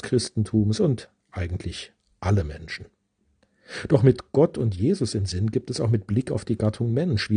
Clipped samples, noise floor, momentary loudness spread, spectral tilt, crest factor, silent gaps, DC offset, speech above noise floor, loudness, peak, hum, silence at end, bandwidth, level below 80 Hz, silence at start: under 0.1%; -67 dBFS; 15 LU; -7 dB/octave; 20 dB; none; under 0.1%; 44 dB; -24 LUFS; -4 dBFS; none; 0 s; 10 kHz; -48 dBFS; 0.05 s